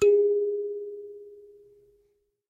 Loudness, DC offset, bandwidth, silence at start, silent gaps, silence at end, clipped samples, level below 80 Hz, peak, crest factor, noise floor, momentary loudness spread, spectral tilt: -26 LUFS; under 0.1%; 7.6 kHz; 0 s; none; 1.1 s; under 0.1%; -68 dBFS; -12 dBFS; 14 dB; -70 dBFS; 24 LU; -5 dB/octave